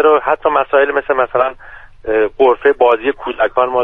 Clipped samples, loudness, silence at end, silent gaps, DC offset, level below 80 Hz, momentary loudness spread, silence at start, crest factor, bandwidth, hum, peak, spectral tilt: under 0.1%; -14 LUFS; 0 s; none; under 0.1%; -44 dBFS; 7 LU; 0 s; 14 dB; 3.9 kHz; none; 0 dBFS; -6.5 dB/octave